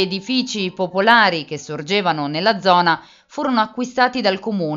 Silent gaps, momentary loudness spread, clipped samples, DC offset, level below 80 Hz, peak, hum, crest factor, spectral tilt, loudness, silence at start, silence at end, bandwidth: none; 11 LU; under 0.1%; under 0.1%; -62 dBFS; 0 dBFS; none; 18 dB; -4.5 dB/octave; -18 LUFS; 0 s; 0 s; 7.8 kHz